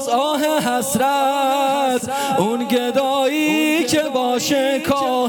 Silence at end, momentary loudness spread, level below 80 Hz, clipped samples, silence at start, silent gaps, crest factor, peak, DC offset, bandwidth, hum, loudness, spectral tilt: 0 s; 2 LU; -58 dBFS; under 0.1%; 0 s; none; 14 dB; -4 dBFS; under 0.1%; over 20 kHz; none; -18 LUFS; -3.5 dB/octave